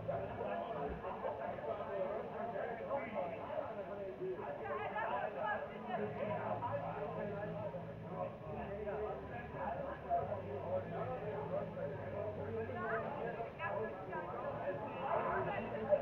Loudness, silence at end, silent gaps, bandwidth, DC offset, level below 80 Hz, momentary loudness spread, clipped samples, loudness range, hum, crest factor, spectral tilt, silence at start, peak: -42 LUFS; 0 s; none; 6.4 kHz; under 0.1%; -64 dBFS; 5 LU; under 0.1%; 2 LU; none; 20 dB; -8.5 dB/octave; 0 s; -20 dBFS